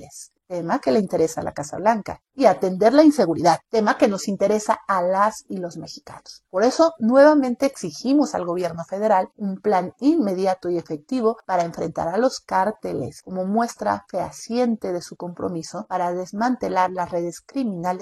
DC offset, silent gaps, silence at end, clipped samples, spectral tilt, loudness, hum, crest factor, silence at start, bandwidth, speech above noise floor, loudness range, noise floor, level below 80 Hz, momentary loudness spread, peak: under 0.1%; none; 0 s; under 0.1%; -5.5 dB/octave; -21 LUFS; none; 20 dB; 0 s; 12.5 kHz; 22 dB; 6 LU; -43 dBFS; -60 dBFS; 13 LU; -2 dBFS